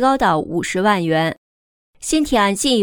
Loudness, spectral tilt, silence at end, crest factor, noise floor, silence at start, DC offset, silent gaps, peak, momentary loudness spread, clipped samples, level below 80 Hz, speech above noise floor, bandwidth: -17 LUFS; -4 dB/octave; 0 s; 14 dB; under -90 dBFS; 0 s; under 0.1%; 1.38-1.93 s; -4 dBFS; 7 LU; under 0.1%; -42 dBFS; over 73 dB; 19.5 kHz